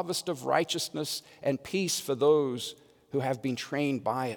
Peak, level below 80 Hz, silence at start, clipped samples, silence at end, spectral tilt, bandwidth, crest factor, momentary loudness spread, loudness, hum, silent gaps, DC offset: -10 dBFS; -74 dBFS; 0 s; under 0.1%; 0 s; -4 dB/octave; over 20 kHz; 20 dB; 9 LU; -30 LUFS; none; none; under 0.1%